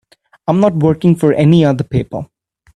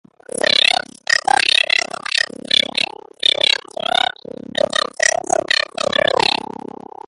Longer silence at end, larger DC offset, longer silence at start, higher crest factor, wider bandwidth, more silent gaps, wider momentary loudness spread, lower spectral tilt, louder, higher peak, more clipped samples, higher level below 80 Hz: second, 0.5 s vs 0.75 s; neither; about the same, 0.5 s vs 0.45 s; about the same, 14 dB vs 18 dB; about the same, 11.5 kHz vs 11.5 kHz; neither; first, 15 LU vs 10 LU; first, -8.5 dB/octave vs -0.5 dB/octave; first, -13 LUFS vs -16 LUFS; about the same, 0 dBFS vs 0 dBFS; neither; first, -44 dBFS vs -58 dBFS